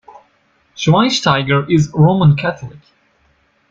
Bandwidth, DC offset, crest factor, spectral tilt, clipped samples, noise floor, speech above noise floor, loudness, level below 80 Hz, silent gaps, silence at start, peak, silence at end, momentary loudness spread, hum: 7.6 kHz; under 0.1%; 14 dB; -6 dB/octave; under 0.1%; -58 dBFS; 44 dB; -13 LUFS; -46 dBFS; none; 0.8 s; -2 dBFS; 0.95 s; 11 LU; none